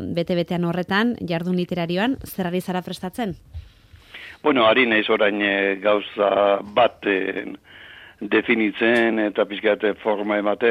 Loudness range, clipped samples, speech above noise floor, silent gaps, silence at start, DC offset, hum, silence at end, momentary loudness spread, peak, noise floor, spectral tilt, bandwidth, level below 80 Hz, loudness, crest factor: 6 LU; under 0.1%; 26 dB; none; 0 s; under 0.1%; none; 0 s; 13 LU; -6 dBFS; -47 dBFS; -6 dB/octave; 16 kHz; -54 dBFS; -21 LUFS; 16 dB